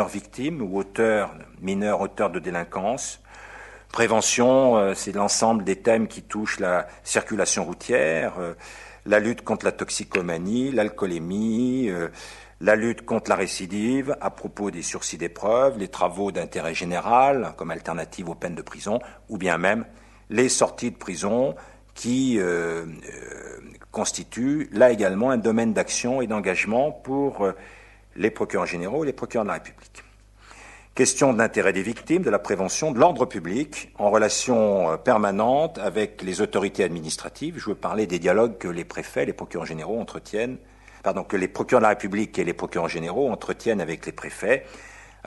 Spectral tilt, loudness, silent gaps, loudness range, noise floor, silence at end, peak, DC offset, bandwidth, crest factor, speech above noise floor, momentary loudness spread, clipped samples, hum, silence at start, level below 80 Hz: -4 dB/octave; -24 LUFS; none; 5 LU; -50 dBFS; 0.2 s; -4 dBFS; under 0.1%; 12 kHz; 20 dB; 26 dB; 13 LU; under 0.1%; none; 0 s; -54 dBFS